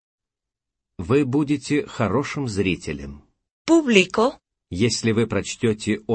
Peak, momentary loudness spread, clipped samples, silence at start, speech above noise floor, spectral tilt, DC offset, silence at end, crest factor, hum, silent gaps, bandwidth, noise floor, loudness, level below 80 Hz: 0 dBFS; 16 LU; under 0.1%; 1 s; 66 dB; -5 dB/octave; under 0.1%; 0 s; 22 dB; none; 3.51-3.65 s; 8.8 kHz; -86 dBFS; -21 LUFS; -50 dBFS